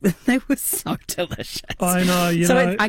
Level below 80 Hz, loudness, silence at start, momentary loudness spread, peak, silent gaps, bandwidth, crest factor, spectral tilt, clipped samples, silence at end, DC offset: -44 dBFS; -21 LUFS; 0 s; 10 LU; -4 dBFS; none; 17 kHz; 16 dB; -4.5 dB/octave; under 0.1%; 0 s; under 0.1%